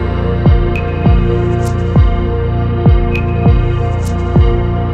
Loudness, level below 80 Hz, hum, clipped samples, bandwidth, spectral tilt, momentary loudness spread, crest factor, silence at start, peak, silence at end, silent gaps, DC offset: -13 LUFS; -16 dBFS; none; under 0.1%; 8.6 kHz; -8.5 dB/octave; 4 LU; 10 dB; 0 s; 0 dBFS; 0 s; none; under 0.1%